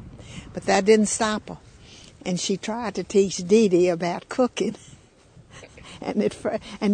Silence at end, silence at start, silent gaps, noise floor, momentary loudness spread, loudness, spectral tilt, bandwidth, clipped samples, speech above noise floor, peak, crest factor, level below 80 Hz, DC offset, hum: 0 s; 0 s; none; -52 dBFS; 22 LU; -23 LUFS; -4.5 dB/octave; 9.6 kHz; under 0.1%; 30 dB; -6 dBFS; 18 dB; -54 dBFS; under 0.1%; none